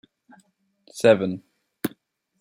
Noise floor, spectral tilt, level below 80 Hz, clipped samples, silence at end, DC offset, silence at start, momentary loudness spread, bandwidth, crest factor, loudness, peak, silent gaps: -63 dBFS; -5.5 dB/octave; -70 dBFS; under 0.1%; 0.5 s; under 0.1%; 0.95 s; 18 LU; 16.5 kHz; 22 dB; -23 LUFS; -4 dBFS; none